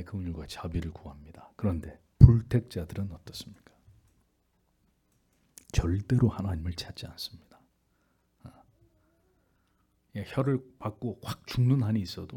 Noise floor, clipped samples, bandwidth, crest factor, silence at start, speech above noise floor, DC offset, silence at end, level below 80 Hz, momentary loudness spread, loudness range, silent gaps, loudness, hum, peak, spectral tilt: -72 dBFS; under 0.1%; 13.5 kHz; 30 dB; 0 s; 42 dB; under 0.1%; 0 s; -42 dBFS; 19 LU; 16 LU; none; -28 LUFS; none; 0 dBFS; -7.5 dB/octave